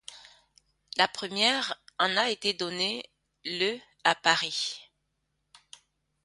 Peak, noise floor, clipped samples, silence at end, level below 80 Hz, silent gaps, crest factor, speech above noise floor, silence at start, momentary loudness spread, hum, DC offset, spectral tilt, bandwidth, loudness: -6 dBFS; -78 dBFS; under 0.1%; 1.4 s; -74 dBFS; none; 26 dB; 50 dB; 0.1 s; 13 LU; none; under 0.1%; -2 dB/octave; 11.5 kHz; -27 LUFS